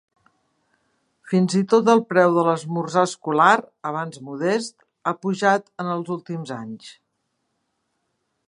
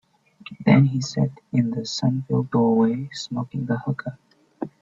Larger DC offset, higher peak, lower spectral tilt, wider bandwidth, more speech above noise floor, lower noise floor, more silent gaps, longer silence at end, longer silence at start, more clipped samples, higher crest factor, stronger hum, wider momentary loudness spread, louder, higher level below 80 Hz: neither; about the same, -2 dBFS vs -4 dBFS; second, -5.5 dB/octave vs -7 dB/octave; first, 11 kHz vs 7.8 kHz; first, 54 dB vs 25 dB; first, -74 dBFS vs -46 dBFS; neither; first, 1.55 s vs 0.15 s; first, 1.25 s vs 0.45 s; neither; about the same, 20 dB vs 20 dB; neither; about the same, 15 LU vs 14 LU; about the same, -21 LUFS vs -22 LUFS; second, -74 dBFS vs -60 dBFS